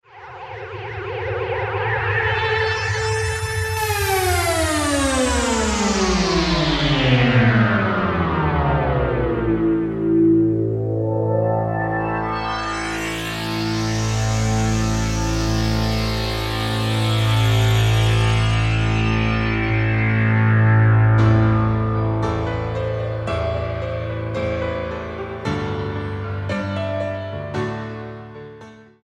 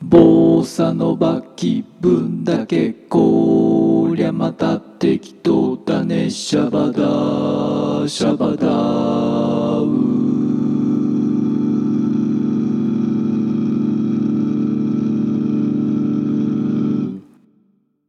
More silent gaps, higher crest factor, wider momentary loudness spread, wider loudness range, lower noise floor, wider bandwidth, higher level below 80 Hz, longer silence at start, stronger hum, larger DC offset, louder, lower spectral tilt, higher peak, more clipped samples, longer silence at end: neither; about the same, 14 dB vs 16 dB; first, 11 LU vs 5 LU; first, 8 LU vs 2 LU; second, -42 dBFS vs -60 dBFS; first, 14.5 kHz vs 11 kHz; first, -32 dBFS vs -52 dBFS; first, 0.15 s vs 0 s; neither; neither; second, -20 LUFS vs -17 LUFS; second, -5.5 dB/octave vs -7.5 dB/octave; second, -4 dBFS vs 0 dBFS; neither; second, 0.2 s vs 0.9 s